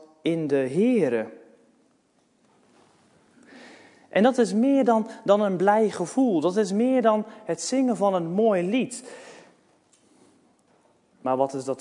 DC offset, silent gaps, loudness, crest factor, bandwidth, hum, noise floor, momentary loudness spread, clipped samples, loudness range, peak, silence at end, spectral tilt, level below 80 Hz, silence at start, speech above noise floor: under 0.1%; none; -23 LUFS; 18 dB; 11 kHz; none; -65 dBFS; 9 LU; under 0.1%; 8 LU; -6 dBFS; 0 s; -6 dB/octave; -80 dBFS; 0.25 s; 43 dB